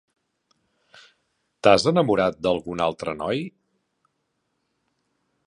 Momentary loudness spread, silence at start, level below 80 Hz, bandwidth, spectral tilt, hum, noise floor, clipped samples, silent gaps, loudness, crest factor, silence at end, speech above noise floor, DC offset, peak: 11 LU; 1.65 s; -56 dBFS; 11.5 kHz; -5.5 dB/octave; none; -75 dBFS; under 0.1%; none; -22 LUFS; 24 dB; 1.95 s; 54 dB; under 0.1%; -2 dBFS